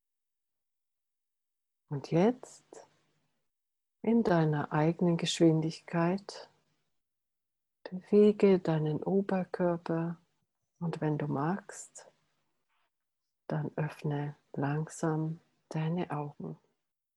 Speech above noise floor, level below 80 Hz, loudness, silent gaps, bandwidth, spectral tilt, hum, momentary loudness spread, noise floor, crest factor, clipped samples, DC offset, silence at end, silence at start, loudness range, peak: 59 dB; -74 dBFS; -31 LUFS; none; 11.5 kHz; -7 dB/octave; none; 19 LU; -89 dBFS; 20 dB; under 0.1%; under 0.1%; 0.6 s; 1.9 s; 8 LU; -14 dBFS